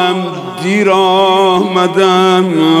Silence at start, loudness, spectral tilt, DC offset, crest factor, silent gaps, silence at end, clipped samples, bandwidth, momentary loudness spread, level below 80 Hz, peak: 0 s; -10 LUFS; -5.5 dB/octave; under 0.1%; 10 dB; none; 0 s; under 0.1%; 13.5 kHz; 8 LU; -60 dBFS; 0 dBFS